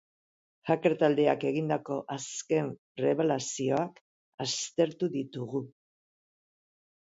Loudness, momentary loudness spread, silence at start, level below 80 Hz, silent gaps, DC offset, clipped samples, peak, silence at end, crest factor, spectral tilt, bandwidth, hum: -30 LUFS; 11 LU; 0.65 s; -76 dBFS; 2.78-2.95 s, 4.01-4.38 s; under 0.1%; under 0.1%; -10 dBFS; 1.3 s; 20 dB; -5 dB/octave; 8 kHz; none